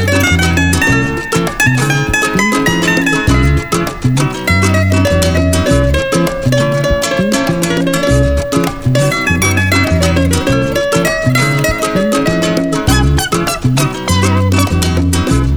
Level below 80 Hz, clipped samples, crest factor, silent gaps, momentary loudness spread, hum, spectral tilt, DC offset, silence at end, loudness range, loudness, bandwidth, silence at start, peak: -24 dBFS; under 0.1%; 12 dB; none; 3 LU; none; -5 dB/octave; under 0.1%; 0 s; 1 LU; -12 LUFS; over 20 kHz; 0 s; 0 dBFS